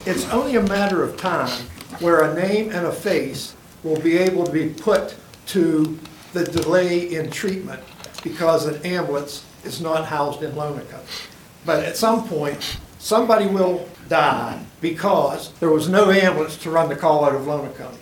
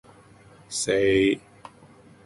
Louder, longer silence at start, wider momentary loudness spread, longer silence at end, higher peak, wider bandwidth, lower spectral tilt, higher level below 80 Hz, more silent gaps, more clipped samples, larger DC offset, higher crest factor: first, -20 LUFS vs -23 LUFS; second, 0 s vs 0.7 s; first, 15 LU vs 12 LU; second, 0 s vs 0.85 s; first, -2 dBFS vs -10 dBFS; first, 19 kHz vs 11.5 kHz; about the same, -5 dB/octave vs -4 dB/octave; about the same, -52 dBFS vs -54 dBFS; neither; neither; neither; about the same, 20 dB vs 16 dB